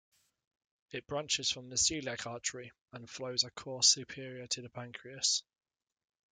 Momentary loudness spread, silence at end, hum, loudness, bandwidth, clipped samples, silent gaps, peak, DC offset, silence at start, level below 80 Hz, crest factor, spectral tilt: 19 LU; 0.9 s; none; -32 LUFS; 12 kHz; under 0.1%; 2.81-2.86 s; -12 dBFS; under 0.1%; 0.95 s; -70 dBFS; 26 dB; -1 dB/octave